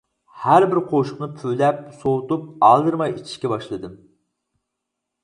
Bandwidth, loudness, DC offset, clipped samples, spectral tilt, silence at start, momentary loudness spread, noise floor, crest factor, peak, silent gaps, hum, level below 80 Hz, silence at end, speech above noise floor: 11 kHz; -20 LUFS; under 0.1%; under 0.1%; -7 dB/octave; 0.35 s; 13 LU; -80 dBFS; 20 dB; 0 dBFS; none; none; -60 dBFS; 1.3 s; 61 dB